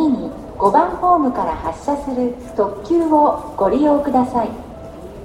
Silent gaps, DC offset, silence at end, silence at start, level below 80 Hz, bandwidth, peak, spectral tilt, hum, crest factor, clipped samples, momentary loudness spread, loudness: none; under 0.1%; 0 s; 0 s; -40 dBFS; 12 kHz; 0 dBFS; -7.5 dB/octave; none; 16 dB; under 0.1%; 12 LU; -17 LUFS